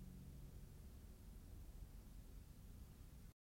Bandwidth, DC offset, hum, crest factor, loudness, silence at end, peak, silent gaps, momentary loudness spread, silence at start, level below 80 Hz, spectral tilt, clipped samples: 16.5 kHz; under 0.1%; none; 12 dB; -61 LUFS; 0.2 s; -46 dBFS; none; 3 LU; 0 s; -60 dBFS; -6 dB/octave; under 0.1%